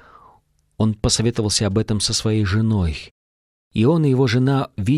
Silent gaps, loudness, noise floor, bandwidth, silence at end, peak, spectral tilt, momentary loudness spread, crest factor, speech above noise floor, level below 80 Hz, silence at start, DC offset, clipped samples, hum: 3.11-3.71 s; -19 LUFS; -57 dBFS; 12.5 kHz; 0 s; -4 dBFS; -5 dB/octave; 6 LU; 16 dB; 39 dB; -38 dBFS; 0.8 s; under 0.1%; under 0.1%; none